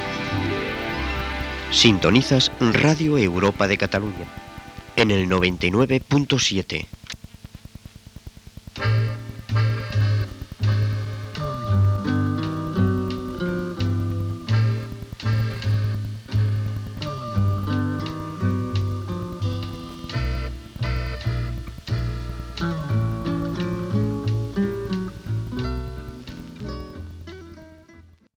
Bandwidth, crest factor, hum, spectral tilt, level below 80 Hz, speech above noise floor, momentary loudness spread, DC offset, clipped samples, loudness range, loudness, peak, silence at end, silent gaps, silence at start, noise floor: 15.5 kHz; 22 dB; none; -5.5 dB/octave; -38 dBFS; 31 dB; 19 LU; under 0.1%; under 0.1%; 9 LU; -23 LUFS; 0 dBFS; 0.35 s; none; 0 s; -50 dBFS